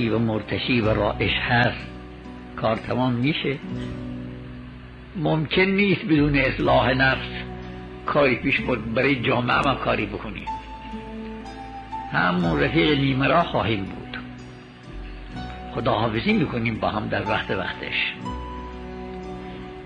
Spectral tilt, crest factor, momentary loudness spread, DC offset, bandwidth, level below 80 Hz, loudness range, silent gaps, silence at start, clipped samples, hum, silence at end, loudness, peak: -7.5 dB/octave; 16 dB; 17 LU; under 0.1%; 9.4 kHz; -40 dBFS; 5 LU; none; 0 s; under 0.1%; none; 0 s; -22 LUFS; -8 dBFS